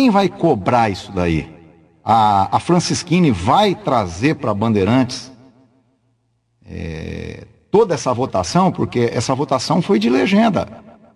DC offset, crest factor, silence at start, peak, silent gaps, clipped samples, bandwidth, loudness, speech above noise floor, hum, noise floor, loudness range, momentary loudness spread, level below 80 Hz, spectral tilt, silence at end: under 0.1%; 16 dB; 0 s; -2 dBFS; none; under 0.1%; 12 kHz; -16 LUFS; 48 dB; none; -64 dBFS; 6 LU; 14 LU; -40 dBFS; -6 dB/octave; 0.35 s